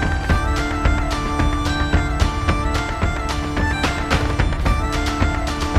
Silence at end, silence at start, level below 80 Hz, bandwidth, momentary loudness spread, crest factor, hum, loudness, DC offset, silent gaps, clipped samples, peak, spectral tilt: 0 s; 0 s; -22 dBFS; 14.5 kHz; 3 LU; 16 dB; none; -20 LUFS; under 0.1%; none; under 0.1%; -2 dBFS; -5.5 dB/octave